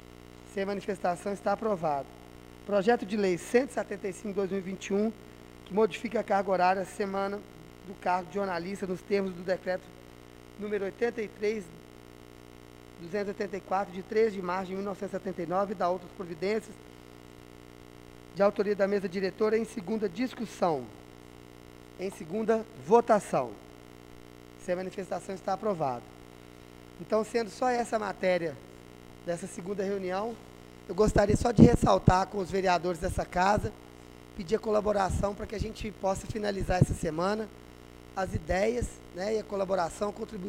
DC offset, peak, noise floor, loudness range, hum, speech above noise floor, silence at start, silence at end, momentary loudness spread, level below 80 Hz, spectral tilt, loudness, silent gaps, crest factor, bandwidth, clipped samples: under 0.1%; -4 dBFS; -50 dBFS; 9 LU; 60 Hz at -55 dBFS; 21 dB; 0.05 s; 0 s; 24 LU; -48 dBFS; -6.5 dB/octave; -30 LUFS; none; 26 dB; 16 kHz; under 0.1%